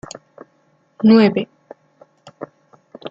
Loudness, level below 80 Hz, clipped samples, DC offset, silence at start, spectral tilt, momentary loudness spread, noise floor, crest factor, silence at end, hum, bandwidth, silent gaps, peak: -14 LUFS; -62 dBFS; under 0.1%; under 0.1%; 1 s; -7 dB/octave; 25 LU; -60 dBFS; 18 dB; 0 s; none; 7.6 kHz; none; -2 dBFS